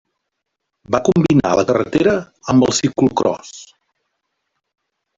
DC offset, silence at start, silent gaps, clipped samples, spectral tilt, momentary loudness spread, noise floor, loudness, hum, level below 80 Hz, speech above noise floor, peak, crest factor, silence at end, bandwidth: under 0.1%; 0.9 s; none; under 0.1%; -5.5 dB/octave; 8 LU; -77 dBFS; -16 LUFS; none; -48 dBFS; 61 dB; -2 dBFS; 16 dB; 1.55 s; 7.8 kHz